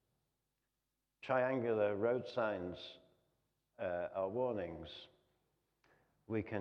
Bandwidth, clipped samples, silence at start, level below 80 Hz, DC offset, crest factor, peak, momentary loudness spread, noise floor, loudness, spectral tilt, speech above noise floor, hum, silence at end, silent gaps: 6.8 kHz; under 0.1%; 1.25 s; -74 dBFS; under 0.1%; 20 dB; -20 dBFS; 16 LU; -88 dBFS; -39 LUFS; -7.5 dB/octave; 50 dB; none; 0 s; none